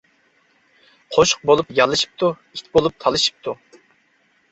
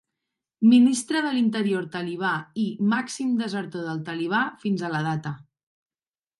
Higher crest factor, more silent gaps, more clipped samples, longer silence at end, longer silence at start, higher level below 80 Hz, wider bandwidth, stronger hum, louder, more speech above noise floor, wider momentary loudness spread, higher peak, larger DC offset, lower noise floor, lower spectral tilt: about the same, 20 dB vs 16 dB; neither; neither; about the same, 0.95 s vs 1 s; first, 1.1 s vs 0.6 s; first, -52 dBFS vs -72 dBFS; second, 8.2 kHz vs 11.5 kHz; neither; first, -18 LUFS vs -24 LUFS; second, 43 dB vs over 67 dB; about the same, 15 LU vs 13 LU; first, -2 dBFS vs -8 dBFS; neither; second, -61 dBFS vs under -90 dBFS; second, -3 dB/octave vs -5 dB/octave